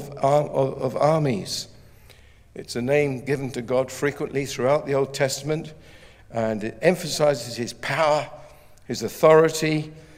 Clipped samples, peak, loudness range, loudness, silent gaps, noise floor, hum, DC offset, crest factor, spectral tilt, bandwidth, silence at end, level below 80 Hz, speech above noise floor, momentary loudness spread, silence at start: under 0.1%; -4 dBFS; 4 LU; -23 LUFS; none; -50 dBFS; none; under 0.1%; 20 dB; -5 dB/octave; 16 kHz; 0.15 s; -54 dBFS; 27 dB; 10 LU; 0 s